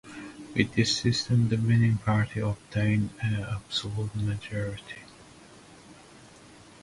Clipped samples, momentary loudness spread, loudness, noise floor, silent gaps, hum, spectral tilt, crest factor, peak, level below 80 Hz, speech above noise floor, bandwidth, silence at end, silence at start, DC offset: under 0.1%; 12 LU; -27 LUFS; -51 dBFS; none; none; -5.5 dB/octave; 22 dB; -6 dBFS; -52 dBFS; 25 dB; 11.5 kHz; 0.9 s; 0.05 s; under 0.1%